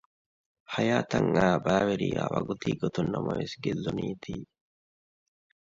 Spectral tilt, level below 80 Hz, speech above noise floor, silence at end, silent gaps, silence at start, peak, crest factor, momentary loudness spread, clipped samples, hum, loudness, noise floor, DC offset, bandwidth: -6.5 dB/octave; -56 dBFS; over 62 dB; 1.3 s; none; 0.7 s; -10 dBFS; 20 dB; 11 LU; under 0.1%; none; -29 LUFS; under -90 dBFS; under 0.1%; 7.8 kHz